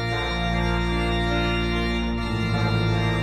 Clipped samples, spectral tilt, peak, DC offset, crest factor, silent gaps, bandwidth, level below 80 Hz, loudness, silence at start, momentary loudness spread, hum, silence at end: under 0.1%; -6.5 dB/octave; -12 dBFS; under 0.1%; 12 dB; none; 12 kHz; -30 dBFS; -24 LUFS; 0 s; 3 LU; none; 0 s